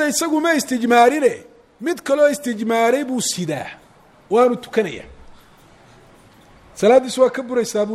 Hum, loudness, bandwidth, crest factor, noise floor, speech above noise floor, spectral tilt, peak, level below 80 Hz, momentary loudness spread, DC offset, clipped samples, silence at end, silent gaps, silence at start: none; -18 LUFS; 15 kHz; 18 dB; -48 dBFS; 31 dB; -3.5 dB/octave; -2 dBFS; -56 dBFS; 12 LU; under 0.1%; under 0.1%; 0 s; none; 0 s